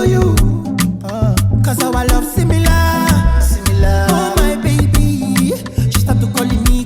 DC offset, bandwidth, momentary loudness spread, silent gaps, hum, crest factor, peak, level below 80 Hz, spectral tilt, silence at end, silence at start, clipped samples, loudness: under 0.1%; 18 kHz; 4 LU; none; none; 10 dB; -2 dBFS; -18 dBFS; -5.5 dB/octave; 0 s; 0 s; under 0.1%; -14 LUFS